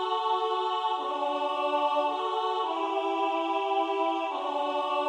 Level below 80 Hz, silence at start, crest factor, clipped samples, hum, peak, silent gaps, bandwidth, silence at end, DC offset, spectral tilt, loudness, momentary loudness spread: under -90 dBFS; 0 s; 14 dB; under 0.1%; none; -16 dBFS; none; 10.5 kHz; 0 s; under 0.1%; -1.5 dB/octave; -28 LUFS; 3 LU